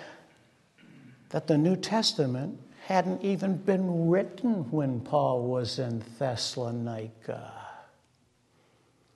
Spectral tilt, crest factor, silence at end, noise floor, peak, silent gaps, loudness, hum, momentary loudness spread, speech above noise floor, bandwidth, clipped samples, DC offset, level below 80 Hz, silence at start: -6 dB/octave; 20 dB; 1.35 s; -67 dBFS; -10 dBFS; none; -29 LUFS; none; 14 LU; 39 dB; 12 kHz; under 0.1%; under 0.1%; -72 dBFS; 0 s